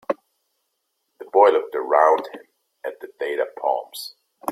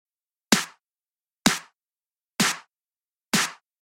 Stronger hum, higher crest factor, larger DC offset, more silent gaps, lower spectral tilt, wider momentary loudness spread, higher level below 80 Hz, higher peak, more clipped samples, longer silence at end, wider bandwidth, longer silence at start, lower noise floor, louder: neither; second, 20 dB vs 28 dB; neither; second, none vs 0.91-0.95 s, 1.90-1.94 s, 3.12-3.16 s; about the same, -3 dB/octave vs -2 dB/octave; first, 18 LU vs 12 LU; second, -78 dBFS vs -60 dBFS; about the same, -2 dBFS vs 0 dBFS; neither; second, 0 s vs 0.3 s; about the same, 15.5 kHz vs 16.5 kHz; second, 0.1 s vs 0.5 s; second, -75 dBFS vs under -90 dBFS; first, -20 LUFS vs -24 LUFS